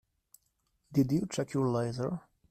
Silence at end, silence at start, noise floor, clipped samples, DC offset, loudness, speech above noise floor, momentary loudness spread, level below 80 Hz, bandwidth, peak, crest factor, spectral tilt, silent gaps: 0.3 s; 0.9 s; -77 dBFS; under 0.1%; under 0.1%; -32 LUFS; 46 dB; 8 LU; -66 dBFS; 14 kHz; -14 dBFS; 18 dB; -7 dB/octave; none